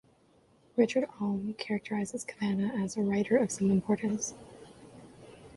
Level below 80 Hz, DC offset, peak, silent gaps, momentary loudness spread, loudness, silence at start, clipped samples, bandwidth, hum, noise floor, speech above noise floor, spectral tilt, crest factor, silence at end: -66 dBFS; under 0.1%; -12 dBFS; none; 19 LU; -31 LUFS; 0.75 s; under 0.1%; 11.5 kHz; none; -65 dBFS; 34 dB; -5.5 dB/octave; 20 dB; 0.05 s